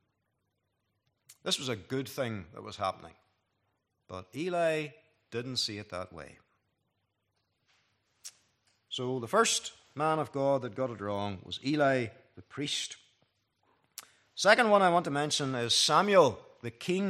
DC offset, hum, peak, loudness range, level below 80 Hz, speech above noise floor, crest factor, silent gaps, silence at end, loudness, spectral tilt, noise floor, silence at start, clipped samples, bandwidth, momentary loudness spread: under 0.1%; none; -6 dBFS; 14 LU; -76 dBFS; 50 dB; 26 dB; none; 0 s; -30 LUFS; -3.5 dB/octave; -80 dBFS; 1.45 s; under 0.1%; 14.5 kHz; 23 LU